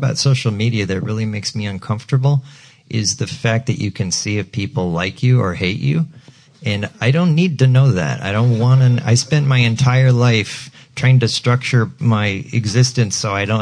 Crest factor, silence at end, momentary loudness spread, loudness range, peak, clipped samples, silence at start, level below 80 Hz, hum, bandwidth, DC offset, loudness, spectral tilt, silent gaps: 12 dB; 0 s; 9 LU; 6 LU; -4 dBFS; under 0.1%; 0 s; -50 dBFS; none; 10.5 kHz; under 0.1%; -16 LUFS; -5.5 dB/octave; none